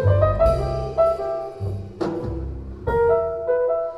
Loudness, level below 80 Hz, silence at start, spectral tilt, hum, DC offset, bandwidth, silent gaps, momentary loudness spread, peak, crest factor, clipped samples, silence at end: -22 LUFS; -32 dBFS; 0 s; -9 dB/octave; none; under 0.1%; 10.5 kHz; none; 12 LU; -6 dBFS; 16 dB; under 0.1%; 0 s